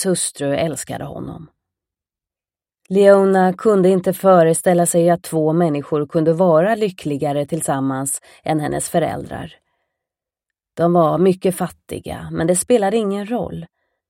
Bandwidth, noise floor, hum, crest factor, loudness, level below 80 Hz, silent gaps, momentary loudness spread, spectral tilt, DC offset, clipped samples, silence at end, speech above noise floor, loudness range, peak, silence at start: 16.5 kHz; under -90 dBFS; none; 18 dB; -17 LUFS; -52 dBFS; none; 16 LU; -5.5 dB/octave; under 0.1%; under 0.1%; 0.45 s; over 73 dB; 7 LU; 0 dBFS; 0 s